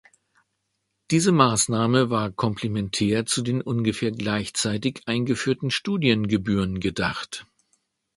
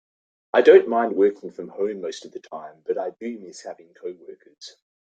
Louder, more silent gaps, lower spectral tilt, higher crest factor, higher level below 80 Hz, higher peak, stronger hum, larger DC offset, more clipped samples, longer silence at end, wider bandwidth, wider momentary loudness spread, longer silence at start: second, -23 LUFS vs -20 LUFS; neither; about the same, -4.5 dB/octave vs -5 dB/octave; about the same, 22 dB vs 20 dB; first, -50 dBFS vs -72 dBFS; about the same, -2 dBFS vs -2 dBFS; neither; neither; neither; first, 0.75 s vs 0.35 s; first, 11.5 kHz vs 8 kHz; second, 7 LU vs 27 LU; first, 1.1 s vs 0.55 s